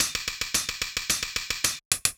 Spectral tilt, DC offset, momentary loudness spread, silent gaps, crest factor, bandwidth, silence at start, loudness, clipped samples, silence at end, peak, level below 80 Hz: 0.5 dB/octave; under 0.1%; 4 LU; 1.85-1.91 s; 26 dB; over 20 kHz; 0 s; -26 LUFS; under 0.1%; 0.05 s; -4 dBFS; -50 dBFS